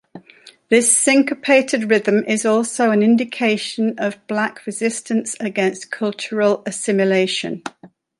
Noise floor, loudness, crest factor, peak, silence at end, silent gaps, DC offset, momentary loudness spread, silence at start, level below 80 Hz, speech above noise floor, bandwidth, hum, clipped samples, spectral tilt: -47 dBFS; -18 LUFS; 16 dB; -2 dBFS; 0.3 s; none; under 0.1%; 10 LU; 0.15 s; -68 dBFS; 29 dB; 11.5 kHz; none; under 0.1%; -3.5 dB/octave